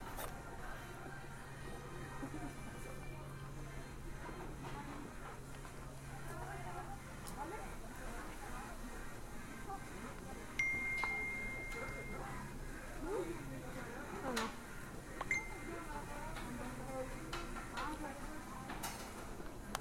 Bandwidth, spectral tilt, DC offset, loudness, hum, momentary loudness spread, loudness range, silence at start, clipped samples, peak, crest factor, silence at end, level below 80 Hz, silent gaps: 16.5 kHz; -4.5 dB/octave; under 0.1%; -46 LUFS; none; 11 LU; 8 LU; 0 s; under 0.1%; -20 dBFS; 24 dB; 0 s; -52 dBFS; none